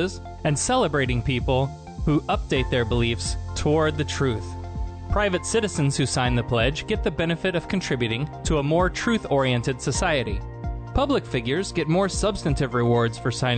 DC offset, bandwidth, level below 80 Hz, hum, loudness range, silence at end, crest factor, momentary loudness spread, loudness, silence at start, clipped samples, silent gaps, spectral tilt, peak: under 0.1%; 9.2 kHz; -34 dBFS; none; 1 LU; 0 s; 14 dB; 7 LU; -24 LUFS; 0 s; under 0.1%; none; -5 dB/octave; -10 dBFS